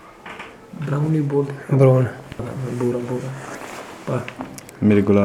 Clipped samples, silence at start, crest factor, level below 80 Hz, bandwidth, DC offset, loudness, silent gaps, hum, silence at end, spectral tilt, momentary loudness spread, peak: under 0.1%; 0 s; 18 dB; -54 dBFS; 13 kHz; under 0.1%; -21 LUFS; none; none; 0 s; -8.5 dB/octave; 19 LU; -2 dBFS